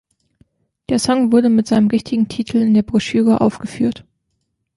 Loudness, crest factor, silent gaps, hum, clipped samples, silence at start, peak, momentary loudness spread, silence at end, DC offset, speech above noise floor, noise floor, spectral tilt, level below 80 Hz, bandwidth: -16 LUFS; 14 dB; none; none; under 0.1%; 0.9 s; -2 dBFS; 7 LU; 0.8 s; under 0.1%; 56 dB; -71 dBFS; -6 dB/octave; -50 dBFS; 11.5 kHz